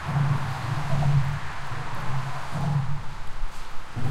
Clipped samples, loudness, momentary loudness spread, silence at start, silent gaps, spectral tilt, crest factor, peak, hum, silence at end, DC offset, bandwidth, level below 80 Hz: under 0.1%; -28 LUFS; 15 LU; 0 s; none; -6.5 dB/octave; 12 dB; -12 dBFS; none; 0 s; under 0.1%; 12.5 kHz; -36 dBFS